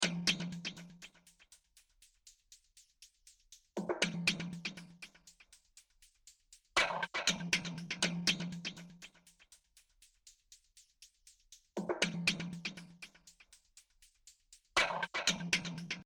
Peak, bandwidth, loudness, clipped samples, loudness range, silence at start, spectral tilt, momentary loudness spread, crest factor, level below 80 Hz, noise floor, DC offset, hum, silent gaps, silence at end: -16 dBFS; 17.5 kHz; -36 LUFS; under 0.1%; 13 LU; 0 s; -2.5 dB/octave; 21 LU; 26 dB; -70 dBFS; -68 dBFS; under 0.1%; none; none; 0 s